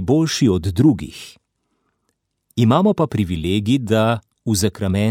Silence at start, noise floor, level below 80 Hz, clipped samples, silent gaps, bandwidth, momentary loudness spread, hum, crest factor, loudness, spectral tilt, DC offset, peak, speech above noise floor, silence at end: 0 s; -71 dBFS; -44 dBFS; under 0.1%; none; 16.5 kHz; 10 LU; none; 16 dB; -18 LUFS; -6 dB/octave; under 0.1%; -2 dBFS; 54 dB; 0 s